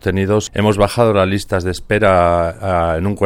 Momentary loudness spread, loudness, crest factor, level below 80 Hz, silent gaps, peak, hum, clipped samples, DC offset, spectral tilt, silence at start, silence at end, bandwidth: 6 LU; -15 LUFS; 14 dB; -34 dBFS; none; 0 dBFS; none; under 0.1%; under 0.1%; -6 dB/octave; 0.05 s; 0 s; 16 kHz